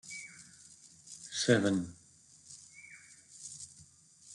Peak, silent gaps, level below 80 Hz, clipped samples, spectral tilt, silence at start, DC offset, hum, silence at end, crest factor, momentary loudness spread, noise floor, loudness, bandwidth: -12 dBFS; none; -74 dBFS; under 0.1%; -4 dB/octave; 0.05 s; under 0.1%; none; 0 s; 26 dB; 26 LU; -61 dBFS; -33 LUFS; 12 kHz